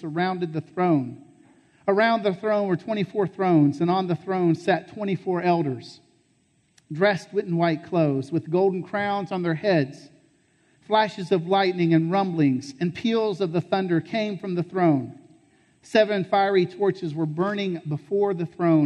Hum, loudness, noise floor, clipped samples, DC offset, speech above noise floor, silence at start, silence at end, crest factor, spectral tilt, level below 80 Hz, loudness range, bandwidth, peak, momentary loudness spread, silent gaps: none; -24 LUFS; -65 dBFS; under 0.1%; under 0.1%; 42 dB; 0 s; 0 s; 16 dB; -7.5 dB/octave; -70 dBFS; 3 LU; 9.6 kHz; -6 dBFS; 7 LU; none